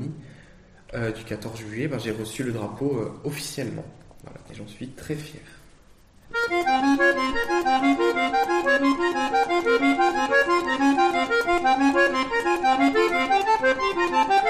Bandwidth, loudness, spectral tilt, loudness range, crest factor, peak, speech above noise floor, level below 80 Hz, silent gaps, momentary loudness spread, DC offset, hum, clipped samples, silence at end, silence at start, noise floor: 13.5 kHz; -22 LUFS; -4.5 dB/octave; 11 LU; 16 dB; -8 dBFS; 26 dB; -50 dBFS; none; 14 LU; under 0.1%; none; under 0.1%; 0 s; 0 s; -53 dBFS